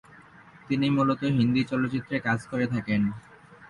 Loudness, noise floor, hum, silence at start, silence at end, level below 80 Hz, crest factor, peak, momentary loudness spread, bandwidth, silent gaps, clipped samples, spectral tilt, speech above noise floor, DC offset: -26 LUFS; -51 dBFS; none; 0.7 s; 0.05 s; -58 dBFS; 14 dB; -12 dBFS; 6 LU; 11 kHz; none; under 0.1%; -7.5 dB/octave; 26 dB; under 0.1%